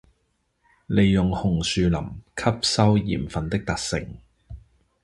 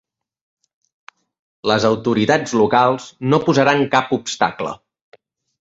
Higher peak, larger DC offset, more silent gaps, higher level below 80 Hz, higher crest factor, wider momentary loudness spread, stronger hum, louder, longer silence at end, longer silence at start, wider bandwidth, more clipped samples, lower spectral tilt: about the same, -4 dBFS vs -2 dBFS; neither; neither; first, -40 dBFS vs -56 dBFS; about the same, 20 dB vs 18 dB; about the same, 9 LU vs 10 LU; neither; second, -23 LUFS vs -17 LUFS; second, 0.45 s vs 0.85 s; second, 0.9 s vs 1.65 s; first, 11.5 kHz vs 8 kHz; neither; about the same, -5.5 dB/octave vs -5 dB/octave